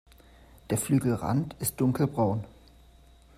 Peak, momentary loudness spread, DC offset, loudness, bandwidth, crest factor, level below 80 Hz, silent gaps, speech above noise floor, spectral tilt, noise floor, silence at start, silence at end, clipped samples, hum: -12 dBFS; 6 LU; under 0.1%; -28 LUFS; 16 kHz; 16 dB; -54 dBFS; none; 28 dB; -6.5 dB/octave; -55 dBFS; 0.7 s; 0.9 s; under 0.1%; none